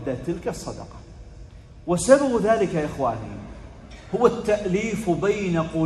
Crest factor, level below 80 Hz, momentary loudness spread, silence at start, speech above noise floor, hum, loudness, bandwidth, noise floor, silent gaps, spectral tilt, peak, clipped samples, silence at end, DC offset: 22 dB; -44 dBFS; 23 LU; 0 s; 21 dB; none; -23 LUFS; 12.5 kHz; -43 dBFS; none; -6 dB/octave; -2 dBFS; under 0.1%; 0 s; under 0.1%